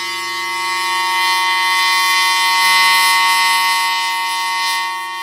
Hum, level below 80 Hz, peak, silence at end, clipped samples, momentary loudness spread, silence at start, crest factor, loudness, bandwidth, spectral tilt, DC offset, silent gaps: none; -76 dBFS; 0 dBFS; 0 s; under 0.1%; 9 LU; 0 s; 16 dB; -13 LUFS; 16 kHz; 2 dB/octave; under 0.1%; none